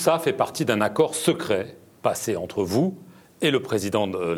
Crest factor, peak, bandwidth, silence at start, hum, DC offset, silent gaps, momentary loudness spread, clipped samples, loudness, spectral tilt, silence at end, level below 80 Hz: 20 dB; -4 dBFS; 20 kHz; 0 s; none; under 0.1%; none; 6 LU; under 0.1%; -24 LUFS; -4.5 dB/octave; 0 s; -66 dBFS